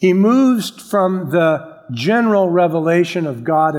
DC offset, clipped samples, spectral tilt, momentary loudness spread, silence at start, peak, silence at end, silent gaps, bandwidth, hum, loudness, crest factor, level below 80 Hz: under 0.1%; under 0.1%; -6.5 dB/octave; 8 LU; 0 s; -2 dBFS; 0 s; none; 16.5 kHz; none; -15 LUFS; 12 dB; -68 dBFS